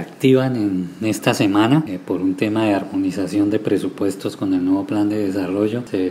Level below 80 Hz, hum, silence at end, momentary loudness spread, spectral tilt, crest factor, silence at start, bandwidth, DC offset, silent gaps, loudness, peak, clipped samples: -62 dBFS; none; 0 s; 7 LU; -6.5 dB/octave; 18 dB; 0 s; 16 kHz; under 0.1%; none; -19 LUFS; 0 dBFS; under 0.1%